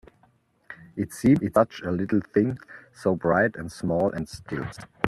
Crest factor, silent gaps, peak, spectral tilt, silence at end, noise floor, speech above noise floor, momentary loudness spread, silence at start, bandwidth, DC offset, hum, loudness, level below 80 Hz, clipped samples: 24 dB; none; -2 dBFS; -7 dB/octave; 0 s; -63 dBFS; 39 dB; 17 LU; 0.7 s; 13 kHz; under 0.1%; none; -25 LUFS; -54 dBFS; under 0.1%